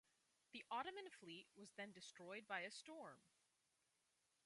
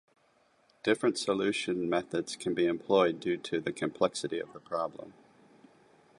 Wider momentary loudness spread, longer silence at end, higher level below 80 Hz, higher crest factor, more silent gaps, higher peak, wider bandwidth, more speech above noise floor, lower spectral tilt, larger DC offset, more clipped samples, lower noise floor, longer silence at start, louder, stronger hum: about the same, 10 LU vs 10 LU; about the same, 1.2 s vs 1.1 s; second, under -90 dBFS vs -70 dBFS; about the same, 24 dB vs 20 dB; neither; second, -34 dBFS vs -12 dBFS; about the same, 11.5 kHz vs 11.5 kHz; second, 32 dB vs 37 dB; second, -2.5 dB/octave vs -4.5 dB/octave; neither; neither; first, -87 dBFS vs -68 dBFS; second, 0.55 s vs 0.85 s; second, -54 LUFS vs -31 LUFS; neither